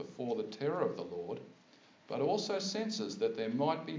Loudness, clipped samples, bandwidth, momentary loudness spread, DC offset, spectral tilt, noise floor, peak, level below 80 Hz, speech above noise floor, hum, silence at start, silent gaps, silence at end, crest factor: -36 LUFS; under 0.1%; 7.6 kHz; 10 LU; under 0.1%; -5 dB/octave; -63 dBFS; -20 dBFS; -82 dBFS; 27 dB; none; 0 s; none; 0 s; 18 dB